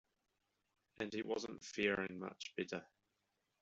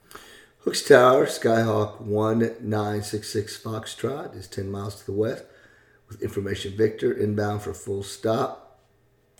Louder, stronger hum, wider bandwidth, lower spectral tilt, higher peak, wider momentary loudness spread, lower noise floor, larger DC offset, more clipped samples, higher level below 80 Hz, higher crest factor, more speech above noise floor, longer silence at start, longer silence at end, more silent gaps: second, -43 LUFS vs -24 LUFS; neither; second, 8 kHz vs 18.5 kHz; second, -3 dB/octave vs -5.5 dB/octave; second, -22 dBFS vs 0 dBFS; second, 10 LU vs 15 LU; first, -86 dBFS vs -63 dBFS; neither; neither; second, -78 dBFS vs -60 dBFS; about the same, 24 dB vs 24 dB; first, 43 dB vs 39 dB; first, 1 s vs 0.15 s; about the same, 0.75 s vs 0.8 s; neither